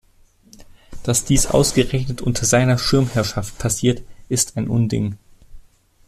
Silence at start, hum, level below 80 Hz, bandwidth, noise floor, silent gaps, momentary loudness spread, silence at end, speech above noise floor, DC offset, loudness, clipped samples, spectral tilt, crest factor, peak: 0.6 s; none; -36 dBFS; 14 kHz; -53 dBFS; none; 9 LU; 0.45 s; 35 dB; under 0.1%; -19 LUFS; under 0.1%; -4.5 dB/octave; 18 dB; -2 dBFS